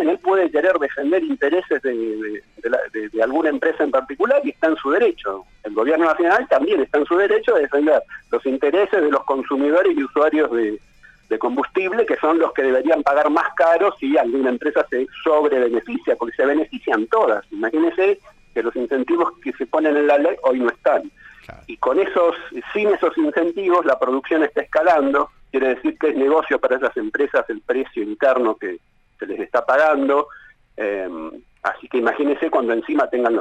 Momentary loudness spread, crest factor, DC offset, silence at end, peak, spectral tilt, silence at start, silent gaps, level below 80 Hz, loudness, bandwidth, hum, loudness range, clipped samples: 9 LU; 12 dB; under 0.1%; 0 s; -6 dBFS; -5.5 dB/octave; 0 s; none; -56 dBFS; -19 LUFS; 8.8 kHz; none; 3 LU; under 0.1%